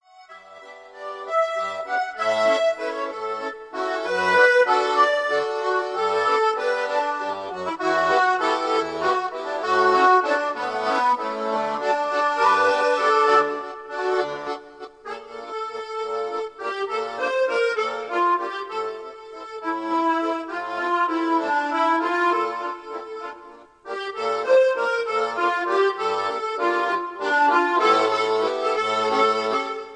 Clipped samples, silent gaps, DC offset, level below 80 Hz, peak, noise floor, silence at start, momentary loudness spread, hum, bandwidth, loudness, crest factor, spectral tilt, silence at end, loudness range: under 0.1%; none; under 0.1%; -68 dBFS; -4 dBFS; -46 dBFS; 0.2 s; 14 LU; none; 10 kHz; -22 LUFS; 18 dB; -3 dB/octave; 0 s; 5 LU